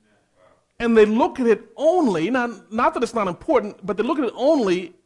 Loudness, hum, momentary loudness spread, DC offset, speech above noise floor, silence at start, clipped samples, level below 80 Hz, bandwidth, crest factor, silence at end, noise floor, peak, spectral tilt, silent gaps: -20 LUFS; none; 8 LU; under 0.1%; 38 dB; 0.8 s; under 0.1%; -54 dBFS; 11.5 kHz; 16 dB; 0.2 s; -58 dBFS; -4 dBFS; -6 dB/octave; none